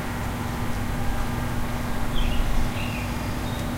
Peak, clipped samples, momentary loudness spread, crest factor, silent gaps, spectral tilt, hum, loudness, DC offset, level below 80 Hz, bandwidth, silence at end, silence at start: -10 dBFS; under 0.1%; 2 LU; 14 dB; none; -5.5 dB/octave; none; -29 LUFS; under 0.1%; -28 dBFS; 16 kHz; 0 s; 0 s